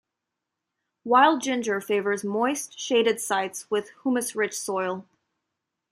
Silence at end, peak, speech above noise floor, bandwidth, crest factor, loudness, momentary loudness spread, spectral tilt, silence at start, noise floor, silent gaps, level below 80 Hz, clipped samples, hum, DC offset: 0.9 s; -6 dBFS; 60 dB; 15.5 kHz; 20 dB; -25 LUFS; 10 LU; -3 dB/octave; 1.05 s; -84 dBFS; none; -78 dBFS; under 0.1%; none; under 0.1%